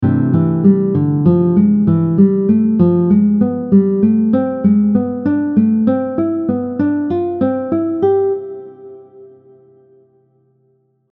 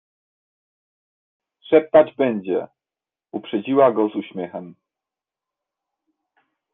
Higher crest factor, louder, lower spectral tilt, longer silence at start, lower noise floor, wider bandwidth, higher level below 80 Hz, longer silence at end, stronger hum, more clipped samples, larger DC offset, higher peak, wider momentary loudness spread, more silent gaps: second, 14 dB vs 22 dB; first, -14 LUFS vs -19 LUFS; first, -13.5 dB/octave vs -9.5 dB/octave; second, 0 s vs 1.7 s; second, -59 dBFS vs under -90 dBFS; about the same, 3.7 kHz vs 3.9 kHz; first, -52 dBFS vs -68 dBFS; second, 1.85 s vs 2 s; neither; neither; neither; about the same, 0 dBFS vs -2 dBFS; second, 6 LU vs 18 LU; neither